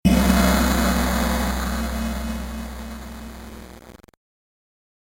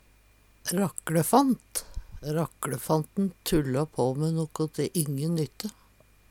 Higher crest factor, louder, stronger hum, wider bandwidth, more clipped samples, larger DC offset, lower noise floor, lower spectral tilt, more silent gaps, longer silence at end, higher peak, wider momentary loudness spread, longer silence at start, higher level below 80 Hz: about the same, 18 dB vs 20 dB; first, -21 LUFS vs -28 LUFS; neither; about the same, 16.5 kHz vs 18 kHz; neither; neither; second, -44 dBFS vs -59 dBFS; about the same, -5 dB/octave vs -5.5 dB/octave; neither; first, 1.1 s vs 0.6 s; first, -4 dBFS vs -8 dBFS; first, 21 LU vs 12 LU; second, 0.05 s vs 0.65 s; first, -28 dBFS vs -50 dBFS